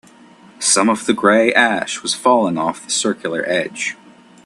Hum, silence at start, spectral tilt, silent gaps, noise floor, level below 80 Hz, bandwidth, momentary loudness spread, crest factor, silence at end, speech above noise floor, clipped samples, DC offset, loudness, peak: none; 0.6 s; -2.5 dB/octave; none; -45 dBFS; -62 dBFS; 12.5 kHz; 9 LU; 18 dB; 0.5 s; 28 dB; under 0.1%; under 0.1%; -16 LUFS; 0 dBFS